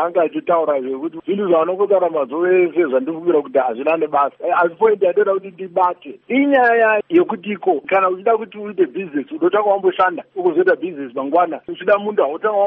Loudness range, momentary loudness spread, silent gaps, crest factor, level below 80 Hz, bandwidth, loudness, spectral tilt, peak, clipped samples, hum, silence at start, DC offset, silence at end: 2 LU; 7 LU; none; 14 dB; -68 dBFS; 3.8 kHz; -17 LUFS; -4 dB/octave; -4 dBFS; under 0.1%; none; 0 s; under 0.1%; 0 s